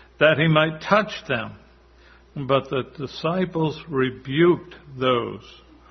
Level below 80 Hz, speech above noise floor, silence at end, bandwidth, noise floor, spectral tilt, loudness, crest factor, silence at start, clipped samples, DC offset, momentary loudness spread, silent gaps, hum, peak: -54 dBFS; 30 dB; 0.4 s; 6.4 kHz; -52 dBFS; -7 dB/octave; -22 LUFS; 20 dB; 0.2 s; under 0.1%; under 0.1%; 15 LU; none; none; -2 dBFS